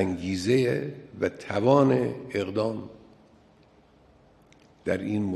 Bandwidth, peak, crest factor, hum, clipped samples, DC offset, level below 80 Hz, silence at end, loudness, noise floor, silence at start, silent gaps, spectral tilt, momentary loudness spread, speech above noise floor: 12.5 kHz; -6 dBFS; 22 dB; none; under 0.1%; under 0.1%; -54 dBFS; 0 s; -26 LUFS; -58 dBFS; 0 s; none; -7 dB/octave; 14 LU; 32 dB